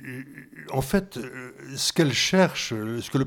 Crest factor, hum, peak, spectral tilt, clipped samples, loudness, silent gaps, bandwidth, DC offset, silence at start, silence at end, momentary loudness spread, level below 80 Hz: 18 dB; none; -8 dBFS; -4 dB/octave; under 0.1%; -24 LUFS; none; 18 kHz; under 0.1%; 0 s; 0 s; 19 LU; -50 dBFS